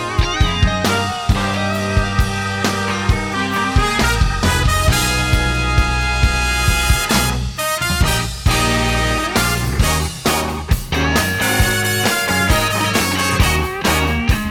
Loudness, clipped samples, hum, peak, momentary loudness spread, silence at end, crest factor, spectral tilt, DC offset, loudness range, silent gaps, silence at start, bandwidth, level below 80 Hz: -16 LUFS; under 0.1%; none; 0 dBFS; 4 LU; 0 s; 16 dB; -4 dB/octave; under 0.1%; 2 LU; none; 0 s; 19.5 kHz; -22 dBFS